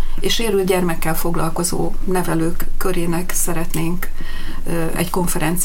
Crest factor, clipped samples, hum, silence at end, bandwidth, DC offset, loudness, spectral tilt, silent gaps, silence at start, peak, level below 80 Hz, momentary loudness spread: 14 dB; under 0.1%; none; 0 s; 17 kHz; under 0.1%; -21 LUFS; -4.5 dB/octave; none; 0 s; -2 dBFS; -20 dBFS; 8 LU